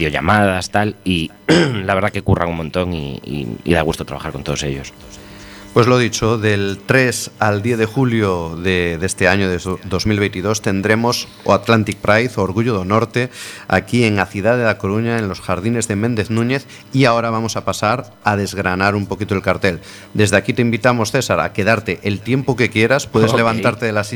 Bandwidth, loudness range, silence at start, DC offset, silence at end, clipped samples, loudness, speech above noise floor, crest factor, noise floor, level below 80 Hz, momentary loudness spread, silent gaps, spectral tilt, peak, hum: 19 kHz; 3 LU; 0 s; under 0.1%; 0 s; under 0.1%; -17 LUFS; 19 dB; 16 dB; -36 dBFS; -42 dBFS; 8 LU; none; -5.5 dB/octave; 0 dBFS; none